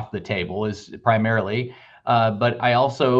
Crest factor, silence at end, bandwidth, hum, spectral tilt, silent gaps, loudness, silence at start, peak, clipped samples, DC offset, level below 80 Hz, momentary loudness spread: 18 dB; 0 s; 7.8 kHz; none; -7 dB/octave; none; -22 LUFS; 0 s; -4 dBFS; under 0.1%; under 0.1%; -58 dBFS; 9 LU